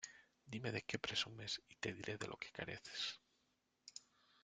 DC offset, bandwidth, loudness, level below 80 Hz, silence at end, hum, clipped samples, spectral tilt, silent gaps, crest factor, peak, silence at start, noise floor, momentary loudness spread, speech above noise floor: under 0.1%; 9.6 kHz; -46 LUFS; -78 dBFS; 0.45 s; none; under 0.1%; -3 dB/octave; none; 26 dB; -22 dBFS; 0 s; -83 dBFS; 16 LU; 36 dB